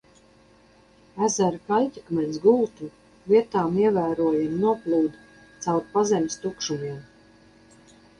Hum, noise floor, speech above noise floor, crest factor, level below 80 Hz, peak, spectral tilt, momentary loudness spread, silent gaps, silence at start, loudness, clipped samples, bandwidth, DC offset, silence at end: none; -56 dBFS; 33 dB; 18 dB; -62 dBFS; -8 dBFS; -5.5 dB/octave; 12 LU; none; 1.15 s; -24 LUFS; under 0.1%; 10.5 kHz; under 0.1%; 1.15 s